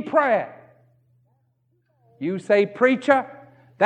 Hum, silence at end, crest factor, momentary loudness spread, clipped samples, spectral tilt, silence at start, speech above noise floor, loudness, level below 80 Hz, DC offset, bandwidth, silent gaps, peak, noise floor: none; 0 s; 20 dB; 15 LU; under 0.1%; -6.5 dB/octave; 0 s; 47 dB; -21 LUFS; -78 dBFS; under 0.1%; 9.6 kHz; none; -2 dBFS; -67 dBFS